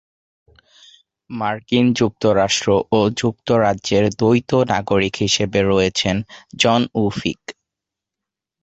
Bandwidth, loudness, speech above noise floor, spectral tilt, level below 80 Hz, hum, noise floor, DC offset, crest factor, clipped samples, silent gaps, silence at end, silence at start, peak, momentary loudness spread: 8.2 kHz; -18 LUFS; 67 dB; -5 dB/octave; -46 dBFS; none; -85 dBFS; under 0.1%; 18 dB; under 0.1%; none; 1.1 s; 1.3 s; -2 dBFS; 9 LU